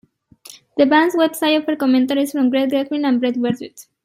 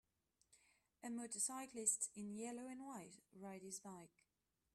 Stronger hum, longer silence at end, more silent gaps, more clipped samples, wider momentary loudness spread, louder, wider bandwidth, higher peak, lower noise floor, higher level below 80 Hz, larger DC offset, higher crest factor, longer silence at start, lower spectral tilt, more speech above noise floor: neither; second, 0.25 s vs 0.65 s; neither; neither; second, 8 LU vs 18 LU; first, -17 LUFS vs -46 LUFS; first, 16 kHz vs 14 kHz; first, -2 dBFS vs -26 dBFS; second, -45 dBFS vs -89 dBFS; first, -66 dBFS vs -90 dBFS; neither; second, 16 dB vs 26 dB; about the same, 0.5 s vs 0.5 s; first, -4.5 dB/octave vs -2.5 dB/octave; second, 28 dB vs 40 dB